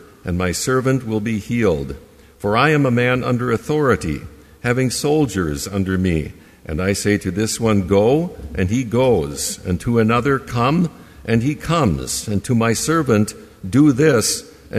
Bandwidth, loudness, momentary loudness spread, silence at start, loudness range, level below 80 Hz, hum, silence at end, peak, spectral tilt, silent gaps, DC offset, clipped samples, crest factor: 15.5 kHz; -18 LUFS; 9 LU; 0.25 s; 2 LU; -40 dBFS; none; 0 s; -2 dBFS; -5.5 dB/octave; none; under 0.1%; under 0.1%; 16 dB